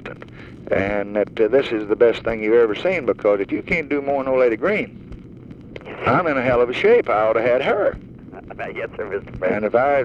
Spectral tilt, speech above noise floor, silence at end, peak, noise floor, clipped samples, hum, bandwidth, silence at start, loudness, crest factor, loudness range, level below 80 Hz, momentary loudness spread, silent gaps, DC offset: -7 dB/octave; 20 dB; 0 s; -2 dBFS; -39 dBFS; under 0.1%; none; 7.2 kHz; 0 s; -19 LUFS; 16 dB; 2 LU; -46 dBFS; 21 LU; none; under 0.1%